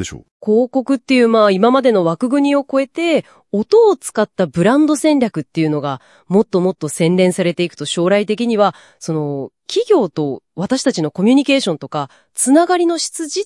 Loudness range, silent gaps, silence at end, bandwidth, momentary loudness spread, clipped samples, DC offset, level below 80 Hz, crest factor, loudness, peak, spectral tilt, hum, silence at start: 3 LU; 0.31-0.40 s; 0 s; 12 kHz; 11 LU; under 0.1%; under 0.1%; -58 dBFS; 14 dB; -15 LUFS; 0 dBFS; -5 dB/octave; none; 0 s